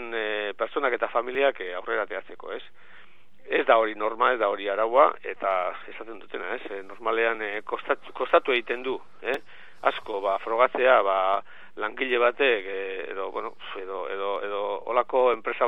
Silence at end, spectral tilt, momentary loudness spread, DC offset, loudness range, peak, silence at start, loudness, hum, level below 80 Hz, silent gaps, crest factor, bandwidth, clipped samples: 0 s; -5 dB/octave; 14 LU; 0.9%; 4 LU; -4 dBFS; 0 s; -26 LUFS; none; -72 dBFS; none; 22 dB; 5.8 kHz; under 0.1%